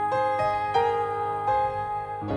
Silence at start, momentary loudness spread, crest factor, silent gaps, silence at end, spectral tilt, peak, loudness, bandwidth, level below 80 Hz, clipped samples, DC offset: 0 s; 6 LU; 14 dB; none; 0 s; -6 dB/octave; -12 dBFS; -26 LUFS; 10.5 kHz; -54 dBFS; under 0.1%; under 0.1%